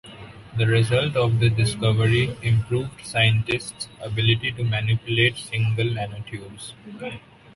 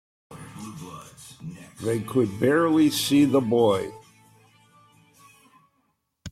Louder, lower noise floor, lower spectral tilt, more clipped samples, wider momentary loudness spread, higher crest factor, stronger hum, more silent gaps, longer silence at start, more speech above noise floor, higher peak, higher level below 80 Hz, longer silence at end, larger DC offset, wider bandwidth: about the same, -22 LUFS vs -22 LUFS; second, -42 dBFS vs -72 dBFS; about the same, -5.5 dB/octave vs -5.5 dB/octave; neither; second, 16 LU vs 23 LU; about the same, 16 dB vs 18 dB; neither; neither; second, 0.05 s vs 0.3 s; second, 20 dB vs 50 dB; about the same, -6 dBFS vs -8 dBFS; first, -46 dBFS vs -64 dBFS; first, 0.35 s vs 0 s; neither; second, 11.5 kHz vs 15 kHz